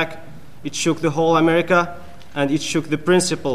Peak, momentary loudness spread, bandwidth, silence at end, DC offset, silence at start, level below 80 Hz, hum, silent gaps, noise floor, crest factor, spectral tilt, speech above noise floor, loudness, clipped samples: -2 dBFS; 15 LU; 15 kHz; 0 s; 2%; 0 s; -52 dBFS; none; none; -41 dBFS; 18 dB; -4.5 dB/octave; 23 dB; -19 LUFS; under 0.1%